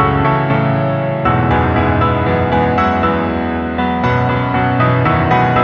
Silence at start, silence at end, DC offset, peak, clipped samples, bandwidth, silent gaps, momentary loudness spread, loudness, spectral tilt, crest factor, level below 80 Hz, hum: 0 s; 0 s; under 0.1%; 0 dBFS; under 0.1%; 6.6 kHz; none; 4 LU; -14 LUFS; -9 dB/octave; 12 dB; -30 dBFS; none